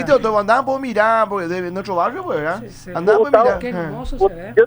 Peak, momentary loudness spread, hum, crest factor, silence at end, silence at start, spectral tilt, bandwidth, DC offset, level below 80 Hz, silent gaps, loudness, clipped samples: 0 dBFS; 10 LU; none; 16 dB; 0 s; 0 s; -6 dB/octave; over 20 kHz; under 0.1%; -38 dBFS; none; -18 LUFS; under 0.1%